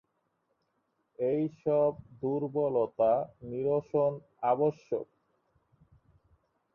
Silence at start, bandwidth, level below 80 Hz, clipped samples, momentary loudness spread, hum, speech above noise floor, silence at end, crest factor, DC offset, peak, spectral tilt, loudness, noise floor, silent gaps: 1.2 s; 6.6 kHz; -70 dBFS; under 0.1%; 9 LU; none; 48 dB; 1.7 s; 16 dB; under 0.1%; -16 dBFS; -10 dB/octave; -31 LUFS; -78 dBFS; none